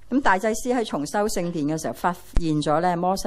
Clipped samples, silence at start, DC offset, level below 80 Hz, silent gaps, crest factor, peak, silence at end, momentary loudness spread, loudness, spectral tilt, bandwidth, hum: under 0.1%; 0 s; under 0.1%; -36 dBFS; none; 18 dB; -4 dBFS; 0 s; 5 LU; -24 LUFS; -5 dB/octave; 15.5 kHz; none